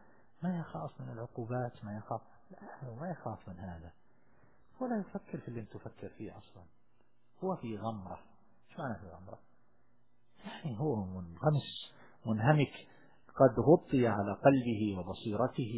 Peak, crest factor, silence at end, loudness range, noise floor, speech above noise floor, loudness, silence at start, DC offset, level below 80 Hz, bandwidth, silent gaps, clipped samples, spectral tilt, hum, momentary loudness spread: -12 dBFS; 24 dB; 0 s; 14 LU; -75 dBFS; 40 dB; -34 LUFS; 0.4 s; 0.1%; -62 dBFS; 4 kHz; none; under 0.1%; -7 dB/octave; none; 21 LU